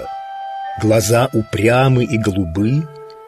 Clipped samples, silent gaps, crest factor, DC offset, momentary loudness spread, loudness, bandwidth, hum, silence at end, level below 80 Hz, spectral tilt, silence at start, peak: under 0.1%; none; 14 dB; under 0.1%; 14 LU; -16 LUFS; 15.5 kHz; none; 0 s; -42 dBFS; -6 dB/octave; 0 s; -2 dBFS